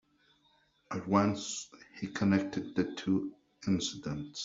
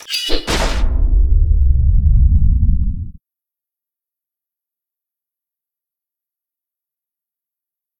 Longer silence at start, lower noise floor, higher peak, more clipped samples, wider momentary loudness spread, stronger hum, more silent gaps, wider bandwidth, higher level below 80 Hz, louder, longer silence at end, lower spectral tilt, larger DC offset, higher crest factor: first, 0.9 s vs 0.1 s; second, -70 dBFS vs -87 dBFS; second, -10 dBFS vs 0 dBFS; neither; first, 13 LU vs 7 LU; neither; neither; second, 7.8 kHz vs 16.5 kHz; second, -66 dBFS vs -18 dBFS; second, -33 LUFS vs -17 LUFS; second, 0 s vs 4.9 s; about the same, -5.5 dB/octave vs -5 dB/octave; neither; first, 24 dB vs 16 dB